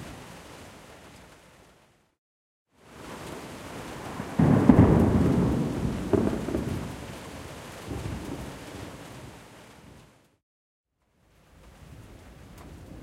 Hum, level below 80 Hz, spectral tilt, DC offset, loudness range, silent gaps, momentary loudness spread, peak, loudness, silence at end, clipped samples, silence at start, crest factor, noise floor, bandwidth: none; -42 dBFS; -7.5 dB/octave; under 0.1%; 23 LU; 2.18-2.66 s, 10.43-10.84 s; 28 LU; -2 dBFS; -25 LUFS; 0 s; under 0.1%; 0 s; 28 dB; -67 dBFS; 16 kHz